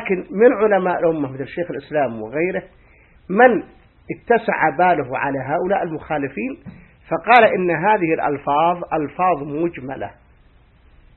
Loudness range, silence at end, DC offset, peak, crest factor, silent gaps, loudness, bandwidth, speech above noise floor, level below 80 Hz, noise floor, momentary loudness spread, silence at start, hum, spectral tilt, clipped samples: 3 LU; 1.05 s; under 0.1%; 0 dBFS; 20 dB; none; -18 LUFS; 4.3 kHz; 33 dB; -52 dBFS; -52 dBFS; 14 LU; 0 s; none; -9 dB/octave; under 0.1%